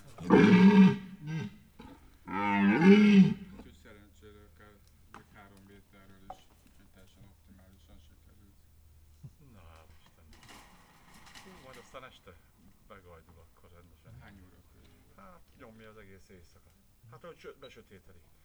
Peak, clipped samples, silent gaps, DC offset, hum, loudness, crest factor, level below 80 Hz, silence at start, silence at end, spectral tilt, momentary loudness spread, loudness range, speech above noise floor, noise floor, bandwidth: -8 dBFS; under 0.1%; none; under 0.1%; none; -24 LUFS; 24 dB; -62 dBFS; 0.2 s; 0.95 s; -8 dB/octave; 30 LU; 29 LU; 9 dB; -62 dBFS; 7 kHz